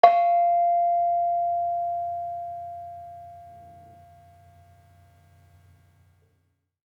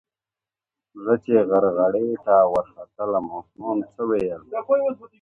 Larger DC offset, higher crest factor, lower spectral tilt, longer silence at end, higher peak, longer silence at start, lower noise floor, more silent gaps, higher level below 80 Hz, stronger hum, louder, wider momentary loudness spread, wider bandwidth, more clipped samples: neither; first, 26 dB vs 18 dB; second, -5 dB/octave vs -9.5 dB/octave; first, 3.25 s vs 0.15 s; about the same, -2 dBFS vs -4 dBFS; second, 0.05 s vs 0.95 s; second, -71 dBFS vs under -90 dBFS; neither; second, -74 dBFS vs -60 dBFS; neither; about the same, -24 LUFS vs -22 LUFS; first, 23 LU vs 13 LU; first, 5.6 kHz vs 4.7 kHz; neither